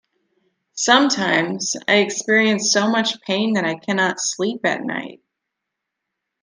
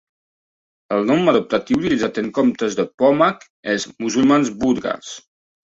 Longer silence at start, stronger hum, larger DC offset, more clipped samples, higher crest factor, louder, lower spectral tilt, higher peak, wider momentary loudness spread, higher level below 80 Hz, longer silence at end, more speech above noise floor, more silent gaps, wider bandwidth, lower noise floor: second, 0.75 s vs 0.9 s; neither; neither; neither; about the same, 20 dB vs 16 dB; about the same, -18 LUFS vs -18 LUFS; second, -2.5 dB/octave vs -5 dB/octave; about the same, 0 dBFS vs -2 dBFS; about the same, 9 LU vs 10 LU; second, -70 dBFS vs -54 dBFS; first, 1.3 s vs 0.6 s; second, 62 dB vs over 72 dB; second, none vs 2.94-2.98 s, 3.50-3.63 s; first, 10.5 kHz vs 8 kHz; second, -81 dBFS vs under -90 dBFS